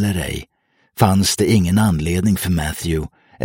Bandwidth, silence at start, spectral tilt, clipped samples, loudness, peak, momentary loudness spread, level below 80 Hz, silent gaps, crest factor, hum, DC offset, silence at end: 17 kHz; 0 s; -5.5 dB/octave; under 0.1%; -18 LUFS; 0 dBFS; 12 LU; -34 dBFS; none; 16 dB; none; under 0.1%; 0 s